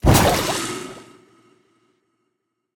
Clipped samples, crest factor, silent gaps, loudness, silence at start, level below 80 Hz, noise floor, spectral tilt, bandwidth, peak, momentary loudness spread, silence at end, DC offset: under 0.1%; 22 dB; none; -19 LUFS; 0.05 s; -32 dBFS; -75 dBFS; -4.5 dB/octave; 19.5 kHz; 0 dBFS; 22 LU; 1.75 s; under 0.1%